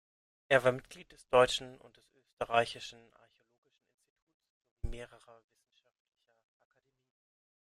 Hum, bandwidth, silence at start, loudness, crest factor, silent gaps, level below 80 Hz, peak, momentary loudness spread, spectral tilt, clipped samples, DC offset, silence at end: none; 13 kHz; 0.5 s; -31 LUFS; 26 dB; 2.33-2.37 s, 3.58-3.62 s, 3.94-3.98 s, 4.10-4.16 s, 4.22-4.27 s, 4.34-4.40 s, 4.50-4.61 s, 4.71-4.77 s; -56 dBFS; -12 dBFS; 24 LU; -4 dB/octave; under 0.1%; under 0.1%; 2.7 s